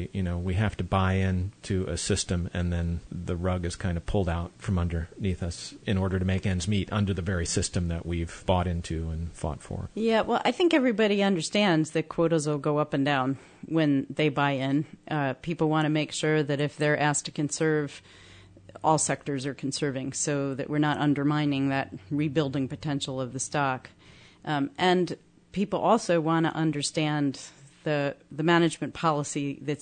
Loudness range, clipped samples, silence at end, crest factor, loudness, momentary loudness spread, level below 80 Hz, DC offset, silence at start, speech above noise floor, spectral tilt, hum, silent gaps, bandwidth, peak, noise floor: 4 LU; under 0.1%; 0 s; 18 dB; -27 LUFS; 9 LU; -48 dBFS; under 0.1%; 0 s; 24 dB; -5 dB/octave; none; none; 9.6 kHz; -10 dBFS; -51 dBFS